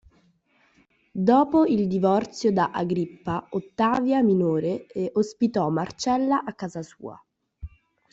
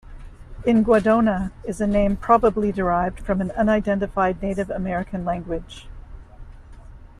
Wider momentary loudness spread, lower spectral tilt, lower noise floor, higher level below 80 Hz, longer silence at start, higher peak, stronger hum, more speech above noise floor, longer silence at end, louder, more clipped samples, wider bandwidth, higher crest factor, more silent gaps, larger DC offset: first, 18 LU vs 11 LU; about the same, -7 dB/octave vs -7.5 dB/octave; first, -64 dBFS vs -41 dBFS; second, -56 dBFS vs -38 dBFS; first, 1.15 s vs 0.05 s; about the same, -6 dBFS vs -4 dBFS; neither; first, 40 dB vs 21 dB; first, 0.45 s vs 0.15 s; second, -24 LUFS vs -21 LUFS; neither; second, 8 kHz vs 11 kHz; about the same, 18 dB vs 18 dB; neither; neither